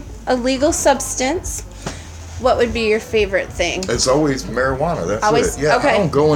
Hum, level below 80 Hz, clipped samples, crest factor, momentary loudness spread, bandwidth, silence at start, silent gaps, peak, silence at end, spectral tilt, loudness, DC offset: none; -34 dBFS; under 0.1%; 16 dB; 12 LU; 17 kHz; 0 s; none; 0 dBFS; 0 s; -4 dB/octave; -17 LUFS; under 0.1%